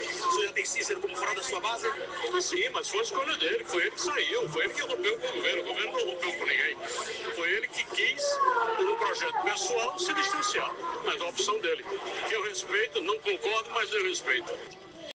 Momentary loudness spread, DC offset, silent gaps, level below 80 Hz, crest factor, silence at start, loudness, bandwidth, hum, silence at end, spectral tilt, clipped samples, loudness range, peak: 5 LU; under 0.1%; none; -70 dBFS; 18 dB; 0 s; -29 LUFS; 10.5 kHz; none; 0 s; -1 dB/octave; under 0.1%; 2 LU; -14 dBFS